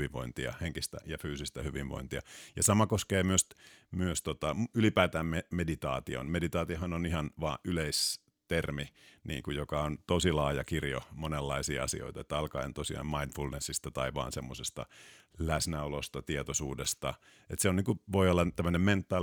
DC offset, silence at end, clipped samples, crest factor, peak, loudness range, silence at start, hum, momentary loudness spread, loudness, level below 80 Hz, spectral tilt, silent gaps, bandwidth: under 0.1%; 0 s; under 0.1%; 24 dB; -10 dBFS; 5 LU; 0 s; none; 11 LU; -33 LUFS; -48 dBFS; -4.5 dB/octave; none; over 20 kHz